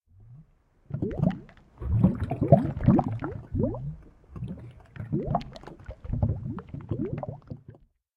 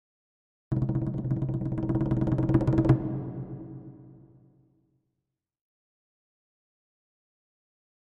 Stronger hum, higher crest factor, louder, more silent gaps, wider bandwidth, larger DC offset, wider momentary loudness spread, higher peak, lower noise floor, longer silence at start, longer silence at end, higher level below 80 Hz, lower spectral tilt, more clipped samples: neither; about the same, 26 dB vs 22 dB; about the same, -28 LUFS vs -28 LUFS; neither; first, 5.4 kHz vs 3.9 kHz; neither; first, 22 LU vs 17 LU; first, -4 dBFS vs -10 dBFS; second, -59 dBFS vs -85 dBFS; second, 0.2 s vs 0.7 s; second, 0.45 s vs 3.95 s; about the same, -42 dBFS vs -46 dBFS; about the same, -11 dB/octave vs -11 dB/octave; neither